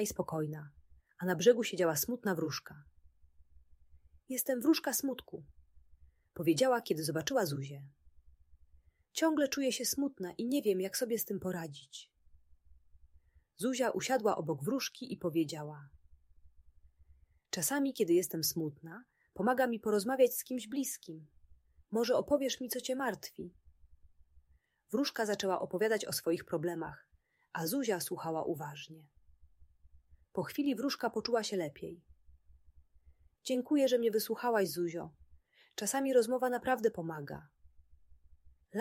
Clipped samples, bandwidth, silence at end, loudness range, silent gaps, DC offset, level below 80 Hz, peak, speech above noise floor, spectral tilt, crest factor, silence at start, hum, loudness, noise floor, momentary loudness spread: under 0.1%; 16 kHz; 0 s; 5 LU; none; under 0.1%; -68 dBFS; -14 dBFS; 39 dB; -4 dB/octave; 22 dB; 0 s; none; -34 LUFS; -73 dBFS; 17 LU